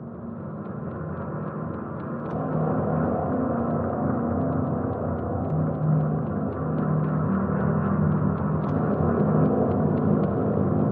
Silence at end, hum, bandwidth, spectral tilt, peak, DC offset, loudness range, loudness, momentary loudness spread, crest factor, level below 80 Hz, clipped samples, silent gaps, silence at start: 0 s; none; 3 kHz; -13 dB/octave; -10 dBFS; under 0.1%; 4 LU; -25 LUFS; 10 LU; 14 dB; -46 dBFS; under 0.1%; none; 0 s